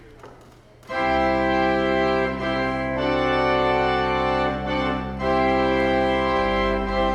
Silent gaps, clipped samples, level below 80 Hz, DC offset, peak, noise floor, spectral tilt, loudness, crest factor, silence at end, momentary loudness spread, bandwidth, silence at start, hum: none; under 0.1%; -38 dBFS; under 0.1%; -8 dBFS; -48 dBFS; -6.5 dB/octave; -22 LUFS; 14 dB; 0 s; 4 LU; 10 kHz; 0 s; none